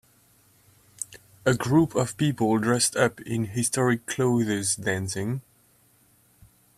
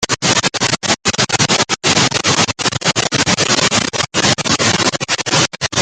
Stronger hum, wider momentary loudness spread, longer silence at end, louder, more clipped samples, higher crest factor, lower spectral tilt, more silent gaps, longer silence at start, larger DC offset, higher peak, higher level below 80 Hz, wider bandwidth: neither; first, 12 LU vs 3 LU; first, 1.4 s vs 0 s; second, -25 LUFS vs -13 LUFS; neither; about the same, 20 dB vs 16 dB; first, -4.5 dB/octave vs -2 dB/octave; neither; first, 1 s vs 0 s; neither; second, -6 dBFS vs 0 dBFS; second, -60 dBFS vs -46 dBFS; first, 15.5 kHz vs 11 kHz